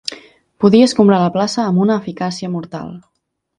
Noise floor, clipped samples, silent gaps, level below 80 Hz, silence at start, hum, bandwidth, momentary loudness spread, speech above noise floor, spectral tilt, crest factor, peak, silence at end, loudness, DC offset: -40 dBFS; under 0.1%; none; -56 dBFS; 0.05 s; none; 11 kHz; 17 LU; 26 dB; -6.5 dB/octave; 16 dB; 0 dBFS; 0.6 s; -14 LUFS; under 0.1%